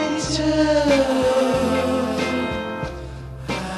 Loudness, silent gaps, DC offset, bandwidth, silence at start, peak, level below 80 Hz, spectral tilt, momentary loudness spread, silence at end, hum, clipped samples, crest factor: -20 LUFS; none; under 0.1%; 13 kHz; 0 s; -6 dBFS; -38 dBFS; -5 dB/octave; 13 LU; 0 s; none; under 0.1%; 14 dB